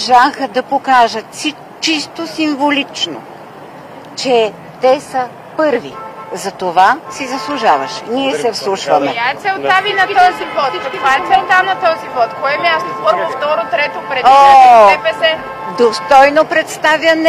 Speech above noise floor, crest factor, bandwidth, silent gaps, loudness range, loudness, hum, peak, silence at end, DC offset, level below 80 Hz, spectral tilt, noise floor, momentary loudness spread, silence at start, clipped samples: 21 dB; 12 dB; 15.5 kHz; none; 8 LU; -12 LUFS; none; 0 dBFS; 0 s; under 0.1%; -52 dBFS; -3 dB/octave; -32 dBFS; 13 LU; 0 s; 0.1%